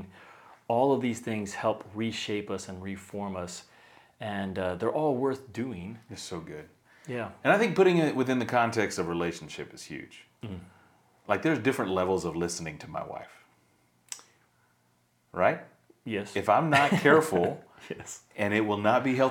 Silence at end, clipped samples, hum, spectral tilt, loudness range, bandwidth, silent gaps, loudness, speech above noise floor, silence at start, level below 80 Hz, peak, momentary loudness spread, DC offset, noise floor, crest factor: 0 s; under 0.1%; none; -5.5 dB/octave; 9 LU; 18.5 kHz; none; -28 LUFS; 41 dB; 0 s; -66 dBFS; -6 dBFS; 20 LU; under 0.1%; -69 dBFS; 22 dB